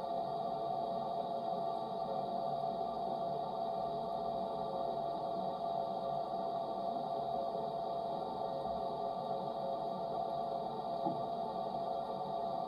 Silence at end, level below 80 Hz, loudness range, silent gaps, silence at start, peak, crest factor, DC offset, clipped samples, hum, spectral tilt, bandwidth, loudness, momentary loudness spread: 0 s; -70 dBFS; 1 LU; none; 0 s; -22 dBFS; 18 dB; under 0.1%; under 0.1%; none; -7.5 dB/octave; 11.5 kHz; -39 LUFS; 1 LU